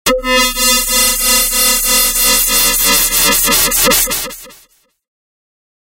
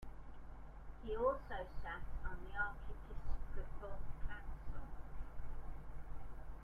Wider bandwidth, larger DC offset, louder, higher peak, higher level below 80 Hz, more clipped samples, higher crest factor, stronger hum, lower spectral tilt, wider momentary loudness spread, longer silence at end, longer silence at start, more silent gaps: first, 16.5 kHz vs 3.5 kHz; neither; first, -9 LUFS vs -48 LUFS; first, 0 dBFS vs -24 dBFS; first, -30 dBFS vs -48 dBFS; neither; about the same, 14 dB vs 18 dB; neither; second, 0 dB/octave vs -7.5 dB/octave; second, 3 LU vs 17 LU; first, 1.45 s vs 0 s; about the same, 0.05 s vs 0 s; neither